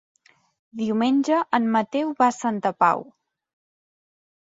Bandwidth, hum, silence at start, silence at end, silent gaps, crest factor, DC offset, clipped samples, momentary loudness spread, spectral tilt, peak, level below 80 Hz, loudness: 7.8 kHz; none; 0.75 s; 1.4 s; none; 20 dB; under 0.1%; under 0.1%; 7 LU; -5.5 dB/octave; -4 dBFS; -72 dBFS; -22 LUFS